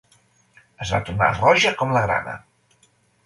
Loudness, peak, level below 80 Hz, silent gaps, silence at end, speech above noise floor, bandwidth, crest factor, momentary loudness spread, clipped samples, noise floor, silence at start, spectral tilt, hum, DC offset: -19 LUFS; -2 dBFS; -46 dBFS; none; 0.85 s; 41 dB; 11.5 kHz; 20 dB; 17 LU; under 0.1%; -61 dBFS; 0.8 s; -4.5 dB/octave; none; under 0.1%